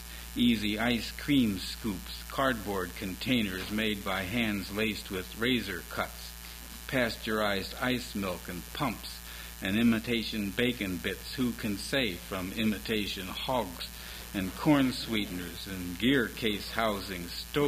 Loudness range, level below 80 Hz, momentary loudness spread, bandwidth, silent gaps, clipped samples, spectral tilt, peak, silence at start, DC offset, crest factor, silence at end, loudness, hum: 2 LU; -48 dBFS; 11 LU; 16.5 kHz; none; under 0.1%; -4.5 dB/octave; -12 dBFS; 0 s; under 0.1%; 20 dB; 0 s; -31 LUFS; none